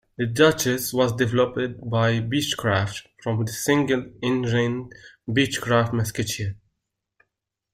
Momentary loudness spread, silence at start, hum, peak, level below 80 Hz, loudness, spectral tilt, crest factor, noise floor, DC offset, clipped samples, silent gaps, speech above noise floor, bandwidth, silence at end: 10 LU; 0.2 s; none; -2 dBFS; -54 dBFS; -23 LUFS; -5 dB/octave; 22 dB; -80 dBFS; under 0.1%; under 0.1%; none; 58 dB; 16 kHz; 1.2 s